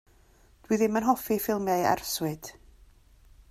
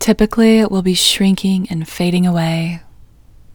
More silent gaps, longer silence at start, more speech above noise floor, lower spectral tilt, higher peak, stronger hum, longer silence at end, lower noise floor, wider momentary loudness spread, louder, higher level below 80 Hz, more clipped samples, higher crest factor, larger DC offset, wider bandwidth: neither; first, 0.7 s vs 0 s; first, 32 dB vs 28 dB; about the same, -4.5 dB/octave vs -5 dB/octave; second, -10 dBFS vs 0 dBFS; neither; first, 1 s vs 0 s; first, -59 dBFS vs -42 dBFS; about the same, 9 LU vs 10 LU; second, -27 LUFS vs -14 LUFS; second, -58 dBFS vs -38 dBFS; neither; first, 20 dB vs 14 dB; neither; second, 16 kHz vs 20 kHz